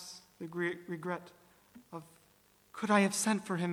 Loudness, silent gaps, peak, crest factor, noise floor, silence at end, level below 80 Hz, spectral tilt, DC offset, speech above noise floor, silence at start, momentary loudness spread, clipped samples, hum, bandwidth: -33 LUFS; none; -14 dBFS; 22 dB; -67 dBFS; 0 s; -80 dBFS; -4.5 dB/octave; under 0.1%; 33 dB; 0 s; 21 LU; under 0.1%; 50 Hz at -60 dBFS; 19 kHz